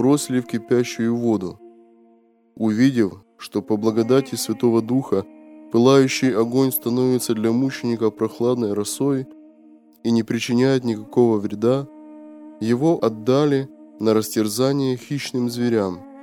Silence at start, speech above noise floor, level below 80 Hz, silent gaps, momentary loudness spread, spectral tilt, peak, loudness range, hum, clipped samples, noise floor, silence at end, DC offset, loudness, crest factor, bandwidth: 0 s; 37 dB; -66 dBFS; none; 8 LU; -6 dB/octave; -2 dBFS; 3 LU; none; under 0.1%; -56 dBFS; 0 s; under 0.1%; -20 LUFS; 18 dB; 17.5 kHz